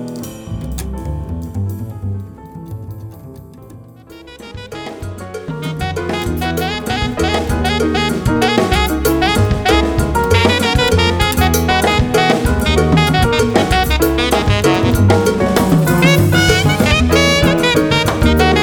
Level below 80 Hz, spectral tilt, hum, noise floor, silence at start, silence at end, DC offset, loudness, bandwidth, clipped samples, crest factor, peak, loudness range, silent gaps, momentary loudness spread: -24 dBFS; -5 dB/octave; none; -37 dBFS; 0 s; 0 s; under 0.1%; -14 LUFS; over 20 kHz; under 0.1%; 14 dB; 0 dBFS; 16 LU; none; 16 LU